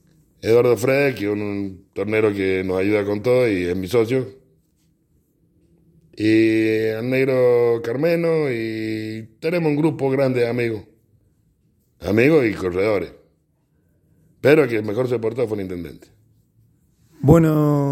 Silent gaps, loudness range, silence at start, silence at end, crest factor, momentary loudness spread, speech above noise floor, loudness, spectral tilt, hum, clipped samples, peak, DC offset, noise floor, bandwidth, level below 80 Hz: none; 3 LU; 0.45 s; 0 s; 20 dB; 12 LU; 45 dB; -19 LUFS; -7.5 dB/octave; none; under 0.1%; 0 dBFS; under 0.1%; -64 dBFS; 16.5 kHz; -50 dBFS